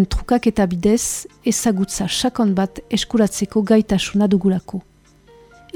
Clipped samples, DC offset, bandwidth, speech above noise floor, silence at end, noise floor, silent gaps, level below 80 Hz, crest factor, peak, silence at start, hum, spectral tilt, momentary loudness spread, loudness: under 0.1%; under 0.1%; 18.5 kHz; 31 dB; 0.95 s; -49 dBFS; none; -36 dBFS; 16 dB; -2 dBFS; 0 s; none; -5 dB/octave; 7 LU; -18 LUFS